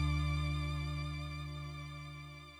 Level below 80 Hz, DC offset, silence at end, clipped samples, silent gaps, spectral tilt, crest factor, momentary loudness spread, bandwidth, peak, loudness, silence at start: -42 dBFS; under 0.1%; 0 s; under 0.1%; none; -6 dB/octave; 14 dB; 12 LU; 11.5 kHz; -24 dBFS; -40 LUFS; 0 s